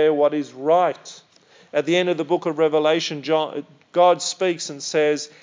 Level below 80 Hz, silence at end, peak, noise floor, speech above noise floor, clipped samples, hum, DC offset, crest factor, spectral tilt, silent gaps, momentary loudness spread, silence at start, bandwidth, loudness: -86 dBFS; 0.15 s; -6 dBFS; -53 dBFS; 33 dB; under 0.1%; none; under 0.1%; 16 dB; -4 dB/octave; none; 9 LU; 0 s; 7.6 kHz; -21 LUFS